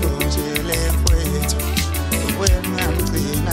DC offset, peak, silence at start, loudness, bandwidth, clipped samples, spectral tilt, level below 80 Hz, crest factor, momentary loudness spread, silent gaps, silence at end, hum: under 0.1%; 0 dBFS; 0 s; -20 LUFS; 16.5 kHz; under 0.1%; -4.5 dB/octave; -22 dBFS; 18 dB; 3 LU; none; 0 s; none